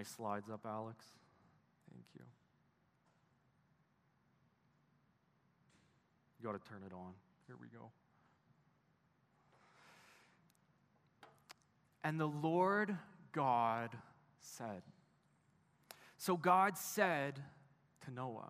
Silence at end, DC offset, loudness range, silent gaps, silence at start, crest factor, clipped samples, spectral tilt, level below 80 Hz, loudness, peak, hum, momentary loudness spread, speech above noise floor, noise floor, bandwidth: 0 s; under 0.1%; 17 LU; none; 0 s; 24 dB; under 0.1%; -5.5 dB/octave; under -90 dBFS; -39 LUFS; -20 dBFS; none; 25 LU; 37 dB; -77 dBFS; 15 kHz